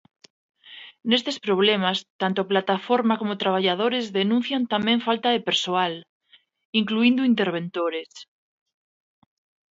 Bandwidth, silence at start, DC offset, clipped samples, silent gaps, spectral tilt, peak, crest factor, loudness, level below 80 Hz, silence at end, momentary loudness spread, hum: 7.8 kHz; 0.65 s; under 0.1%; under 0.1%; 2.10-2.19 s, 6.09-6.20 s, 6.65-6.73 s; -5 dB/octave; -4 dBFS; 20 dB; -23 LUFS; -72 dBFS; 1.45 s; 8 LU; none